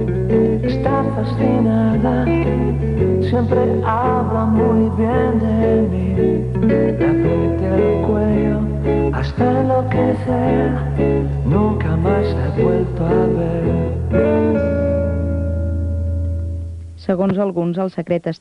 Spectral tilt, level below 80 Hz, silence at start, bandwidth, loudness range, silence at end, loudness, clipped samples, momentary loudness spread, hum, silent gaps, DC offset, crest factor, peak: -10 dB/octave; -28 dBFS; 0 s; 6 kHz; 3 LU; 0.05 s; -17 LUFS; under 0.1%; 5 LU; none; none; under 0.1%; 14 dB; -2 dBFS